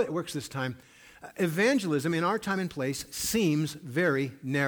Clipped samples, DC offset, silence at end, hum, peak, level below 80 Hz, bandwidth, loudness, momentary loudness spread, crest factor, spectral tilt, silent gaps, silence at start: under 0.1%; under 0.1%; 0 s; none; -14 dBFS; -62 dBFS; over 20 kHz; -29 LUFS; 10 LU; 14 dB; -5 dB/octave; none; 0 s